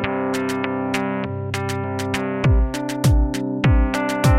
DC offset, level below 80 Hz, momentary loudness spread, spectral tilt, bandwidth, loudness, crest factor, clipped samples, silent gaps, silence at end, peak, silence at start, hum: under 0.1%; -24 dBFS; 6 LU; -6 dB/octave; 15.5 kHz; -21 LUFS; 16 dB; under 0.1%; none; 0 s; -4 dBFS; 0 s; none